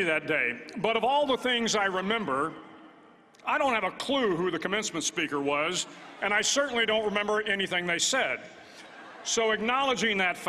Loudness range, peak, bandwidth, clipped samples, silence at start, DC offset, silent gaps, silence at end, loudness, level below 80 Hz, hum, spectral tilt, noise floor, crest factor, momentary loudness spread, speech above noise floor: 2 LU; -12 dBFS; 14.5 kHz; under 0.1%; 0 s; under 0.1%; none; 0 s; -27 LUFS; -66 dBFS; none; -2 dB/octave; -56 dBFS; 18 dB; 10 LU; 28 dB